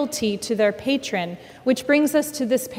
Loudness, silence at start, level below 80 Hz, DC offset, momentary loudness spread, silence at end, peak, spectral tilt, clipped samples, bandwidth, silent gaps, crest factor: -22 LUFS; 0 s; -60 dBFS; under 0.1%; 9 LU; 0 s; -6 dBFS; -4 dB/octave; under 0.1%; 16.5 kHz; none; 16 dB